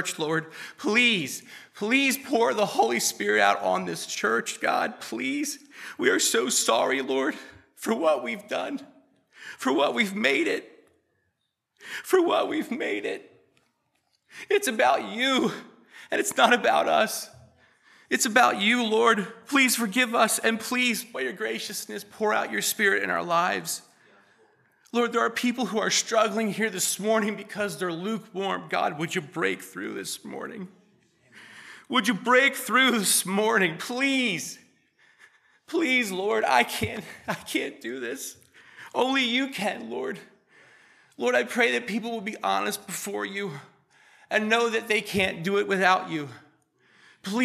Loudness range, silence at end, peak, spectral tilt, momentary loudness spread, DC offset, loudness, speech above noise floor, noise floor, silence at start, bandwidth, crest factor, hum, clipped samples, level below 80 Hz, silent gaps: 6 LU; 0 s; -4 dBFS; -2.5 dB/octave; 13 LU; under 0.1%; -25 LUFS; 52 dB; -78 dBFS; 0 s; 15 kHz; 22 dB; none; under 0.1%; -70 dBFS; none